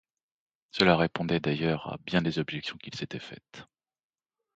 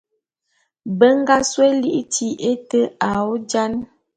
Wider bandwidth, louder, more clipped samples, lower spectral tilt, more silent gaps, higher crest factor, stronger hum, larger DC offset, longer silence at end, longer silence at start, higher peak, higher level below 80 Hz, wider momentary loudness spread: second, 7.8 kHz vs 9.6 kHz; second, -29 LUFS vs -18 LUFS; neither; first, -6.5 dB/octave vs -4 dB/octave; neither; first, 24 dB vs 18 dB; neither; neither; first, 0.95 s vs 0.3 s; about the same, 0.75 s vs 0.85 s; second, -6 dBFS vs 0 dBFS; about the same, -58 dBFS vs -54 dBFS; first, 18 LU vs 9 LU